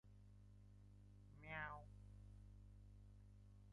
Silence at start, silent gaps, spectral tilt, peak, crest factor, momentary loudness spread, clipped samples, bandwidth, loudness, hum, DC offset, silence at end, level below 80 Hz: 0.05 s; none; -6.5 dB/octave; -36 dBFS; 24 dB; 16 LU; under 0.1%; 11 kHz; -60 LUFS; 50 Hz at -60 dBFS; under 0.1%; 0 s; -66 dBFS